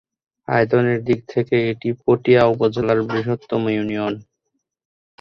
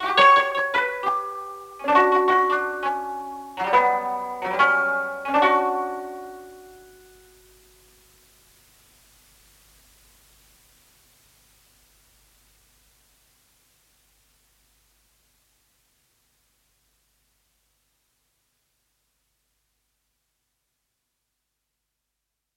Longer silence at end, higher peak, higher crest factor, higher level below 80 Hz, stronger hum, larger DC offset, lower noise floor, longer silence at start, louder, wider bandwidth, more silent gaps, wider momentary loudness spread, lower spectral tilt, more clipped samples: second, 1 s vs 15.8 s; about the same, -2 dBFS vs -4 dBFS; about the same, 18 dB vs 22 dB; first, -54 dBFS vs -66 dBFS; neither; neither; second, -75 dBFS vs -82 dBFS; first, 0.5 s vs 0 s; about the same, -19 LUFS vs -21 LUFS; second, 6.4 kHz vs 17 kHz; neither; second, 8 LU vs 18 LU; first, -8.5 dB/octave vs -3 dB/octave; neither